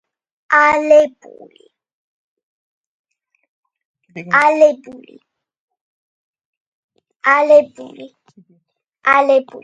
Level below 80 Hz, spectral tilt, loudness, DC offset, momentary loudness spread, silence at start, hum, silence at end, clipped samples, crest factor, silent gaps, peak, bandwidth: -64 dBFS; -4.5 dB/octave; -13 LUFS; under 0.1%; 20 LU; 0.5 s; none; 0.05 s; under 0.1%; 18 dB; 1.93-2.37 s, 2.43-3.04 s, 3.49-3.63 s, 3.85-3.94 s, 5.57-5.68 s, 5.81-6.34 s, 6.45-6.89 s, 7.16-7.20 s; 0 dBFS; 9 kHz